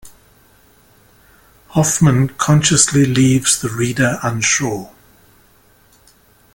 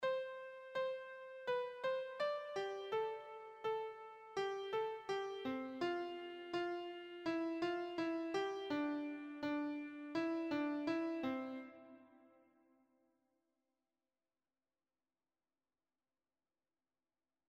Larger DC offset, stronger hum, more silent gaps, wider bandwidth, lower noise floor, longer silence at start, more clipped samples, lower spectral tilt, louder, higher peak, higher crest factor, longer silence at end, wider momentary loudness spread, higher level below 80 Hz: neither; neither; neither; first, 17 kHz vs 9.2 kHz; second, -51 dBFS vs under -90 dBFS; about the same, 0.05 s vs 0 s; neither; about the same, -4 dB/octave vs -5 dB/octave; first, -14 LUFS vs -43 LUFS; first, 0 dBFS vs -28 dBFS; about the same, 18 dB vs 16 dB; second, 1.7 s vs 5.2 s; about the same, 7 LU vs 9 LU; first, -46 dBFS vs -84 dBFS